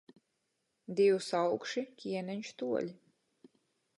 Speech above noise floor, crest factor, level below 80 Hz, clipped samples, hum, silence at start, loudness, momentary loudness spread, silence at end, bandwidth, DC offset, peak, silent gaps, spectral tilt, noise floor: 49 dB; 18 dB; -84 dBFS; under 0.1%; none; 0.9 s; -34 LUFS; 12 LU; 1 s; 11 kHz; under 0.1%; -18 dBFS; none; -5 dB/octave; -82 dBFS